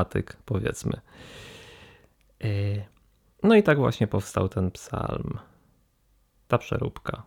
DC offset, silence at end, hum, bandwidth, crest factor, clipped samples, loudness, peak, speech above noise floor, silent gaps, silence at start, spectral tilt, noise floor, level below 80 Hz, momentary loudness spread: under 0.1%; 0.05 s; none; 16.5 kHz; 22 dB; under 0.1%; -26 LUFS; -6 dBFS; 40 dB; none; 0 s; -7 dB/octave; -66 dBFS; -50 dBFS; 24 LU